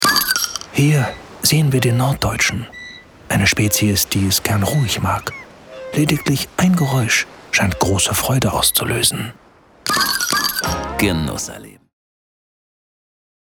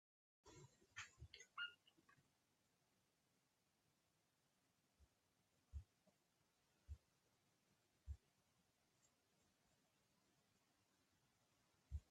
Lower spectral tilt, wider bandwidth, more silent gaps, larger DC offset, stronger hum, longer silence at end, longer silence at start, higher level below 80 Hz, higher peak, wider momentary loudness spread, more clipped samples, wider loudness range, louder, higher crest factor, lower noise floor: about the same, -3.5 dB/octave vs -3 dB/octave; first, over 20 kHz vs 10 kHz; neither; neither; neither; first, 1.7 s vs 0.1 s; second, 0 s vs 0.45 s; first, -40 dBFS vs -70 dBFS; first, 0 dBFS vs -40 dBFS; about the same, 12 LU vs 14 LU; neither; second, 4 LU vs 8 LU; first, -17 LUFS vs -60 LUFS; second, 18 dB vs 26 dB; second, -38 dBFS vs -86 dBFS